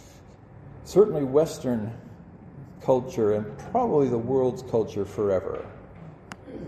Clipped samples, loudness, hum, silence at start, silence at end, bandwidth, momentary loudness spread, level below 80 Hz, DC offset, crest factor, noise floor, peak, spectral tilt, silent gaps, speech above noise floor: under 0.1%; -25 LUFS; none; 0 s; 0 s; 13.5 kHz; 24 LU; -56 dBFS; under 0.1%; 20 dB; -48 dBFS; -6 dBFS; -7.5 dB/octave; none; 24 dB